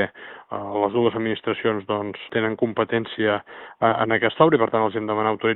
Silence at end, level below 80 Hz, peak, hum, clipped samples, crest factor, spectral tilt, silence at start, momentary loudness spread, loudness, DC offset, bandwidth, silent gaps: 0 s; -62 dBFS; -2 dBFS; none; under 0.1%; 20 dB; -4 dB/octave; 0 s; 10 LU; -22 LUFS; under 0.1%; 4.1 kHz; none